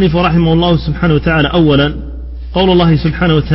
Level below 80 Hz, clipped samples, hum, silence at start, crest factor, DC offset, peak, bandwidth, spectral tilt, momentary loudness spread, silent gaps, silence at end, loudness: -24 dBFS; under 0.1%; none; 0 s; 10 dB; under 0.1%; 0 dBFS; 5.8 kHz; -10.5 dB/octave; 9 LU; none; 0 s; -11 LUFS